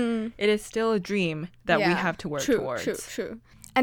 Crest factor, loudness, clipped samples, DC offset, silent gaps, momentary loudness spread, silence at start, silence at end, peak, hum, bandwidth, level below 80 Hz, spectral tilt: 20 dB; -27 LUFS; under 0.1%; under 0.1%; none; 11 LU; 0 s; 0 s; -8 dBFS; none; 18.5 kHz; -56 dBFS; -5 dB/octave